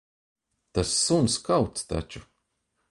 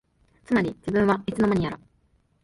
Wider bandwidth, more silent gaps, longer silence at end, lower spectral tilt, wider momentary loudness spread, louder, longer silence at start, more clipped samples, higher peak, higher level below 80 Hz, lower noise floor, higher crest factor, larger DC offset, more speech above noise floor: about the same, 11.5 kHz vs 11.5 kHz; neither; about the same, 0.7 s vs 0.7 s; second, -4 dB/octave vs -7.5 dB/octave; first, 14 LU vs 7 LU; about the same, -25 LUFS vs -24 LUFS; first, 0.75 s vs 0.5 s; neither; about the same, -10 dBFS vs -10 dBFS; about the same, -46 dBFS vs -50 dBFS; first, -76 dBFS vs -65 dBFS; about the same, 18 dB vs 16 dB; neither; first, 51 dB vs 42 dB